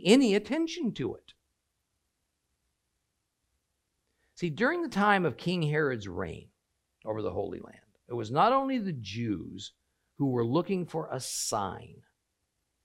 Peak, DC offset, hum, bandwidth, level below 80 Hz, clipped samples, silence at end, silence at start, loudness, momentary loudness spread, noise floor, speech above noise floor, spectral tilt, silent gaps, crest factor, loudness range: -10 dBFS; under 0.1%; none; 16 kHz; -66 dBFS; under 0.1%; 0.9 s; 0 s; -30 LUFS; 15 LU; -81 dBFS; 51 dB; -5 dB/octave; none; 22 dB; 7 LU